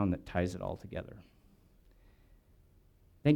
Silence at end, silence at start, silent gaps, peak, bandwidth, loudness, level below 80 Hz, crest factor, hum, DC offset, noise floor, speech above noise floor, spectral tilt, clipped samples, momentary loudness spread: 0 s; 0 s; none; -14 dBFS; 12 kHz; -37 LUFS; -56 dBFS; 22 dB; none; under 0.1%; -64 dBFS; 27 dB; -8 dB/octave; under 0.1%; 16 LU